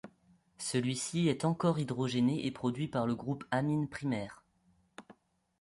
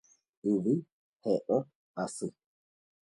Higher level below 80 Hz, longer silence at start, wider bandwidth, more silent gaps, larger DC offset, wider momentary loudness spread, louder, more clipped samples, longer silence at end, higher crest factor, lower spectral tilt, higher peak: first, -68 dBFS vs -76 dBFS; second, 0.05 s vs 0.45 s; about the same, 11.5 kHz vs 11.5 kHz; second, none vs 0.92-1.13 s, 1.75-1.94 s; neither; second, 6 LU vs 10 LU; about the same, -33 LUFS vs -33 LUFS; neither; second, 0.5 s vs 0.75 s; about the same, 16 dB vs 18 dB; second, -5.5 dB/octave vs -7 dB/octave; about the same, -18 dBFS vs -16 dBFS